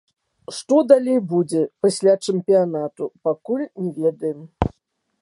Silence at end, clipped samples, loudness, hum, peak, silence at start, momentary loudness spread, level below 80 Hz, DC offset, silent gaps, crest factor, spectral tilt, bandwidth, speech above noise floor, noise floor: 0.55 s; under 0.1%; -20 LUFS; none; 0 dBFS; 0.5 s; 12 LU; -44 dBFS; under 0.1%; none; 20 dB; -6.5 dB/octave; 11.5 kHz; 51 dB; -70 dBFS